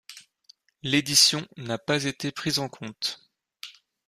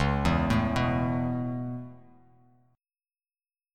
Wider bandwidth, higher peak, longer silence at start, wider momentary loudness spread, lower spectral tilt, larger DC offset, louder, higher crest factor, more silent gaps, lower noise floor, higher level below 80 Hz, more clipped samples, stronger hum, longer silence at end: first, 15.5 kHz vs 13.5 kHz; first, -6 dBFS vs -12 dBFS; about the same, 0.1 s vs 0 s; first, 25 LU vs 13 LU; second, -2.5 dB/octave vs -7 dB/octave; neither; first, -24 LUFS vs -28 LUFS; about the same, 22 dB vs 18 dB; neither; second, -59 dBFS vs under -90 dBFS; second, -64 dBFS vs -40 dBFS; neither; neither; second, 0.35 s vs 1.75 s